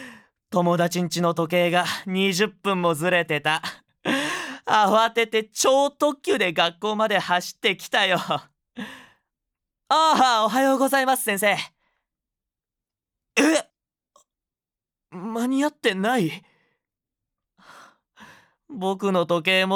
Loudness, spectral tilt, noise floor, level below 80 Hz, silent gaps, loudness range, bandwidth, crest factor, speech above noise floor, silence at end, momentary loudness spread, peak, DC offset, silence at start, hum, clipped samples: -22 LUFS; -4 dB/octave; under -90 dBFS; -74 dBFS; none; 7 LU; 19.5 kHz; 18 dB; over 68 dB; 0 s; 10 LU; -6 dBFS; under 0.1%; 0 s; none; under 0.1%